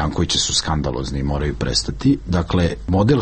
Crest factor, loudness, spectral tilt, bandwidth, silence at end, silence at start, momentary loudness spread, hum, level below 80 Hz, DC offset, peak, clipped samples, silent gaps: 14 dB; -19 LUFS; -4.5 dB/octave; 8.8 kHz; 0 s; 0 s; 6 LU; none; -30 dBFS; under 0.1%; -4 dBFS; under 0.1%; none